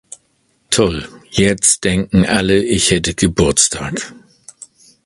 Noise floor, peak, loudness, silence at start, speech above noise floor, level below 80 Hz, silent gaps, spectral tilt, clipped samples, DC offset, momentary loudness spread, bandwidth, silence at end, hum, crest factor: -61 dBFS; 0 dBFS; -14 LUFS; 0.7 s; 46 dB; -34 dBFS; none; -3.5 dB/octave; under 0.1%; under 0.1%; 11 LU; 11.5 kHz; 0.85 s; none; 16 dB